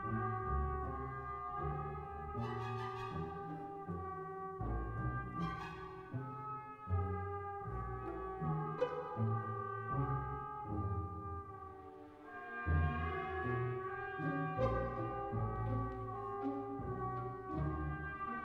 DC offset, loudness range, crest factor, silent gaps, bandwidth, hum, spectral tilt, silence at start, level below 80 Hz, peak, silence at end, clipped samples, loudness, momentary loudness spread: under 0.1%; 4 LU; 18 dB; none; 6.8 kHz; none; -9 dB/octave; 0 s; -52 dBFS; -24 dBFS; 0 s; under 0.1%; -42 LUFS; 8 LU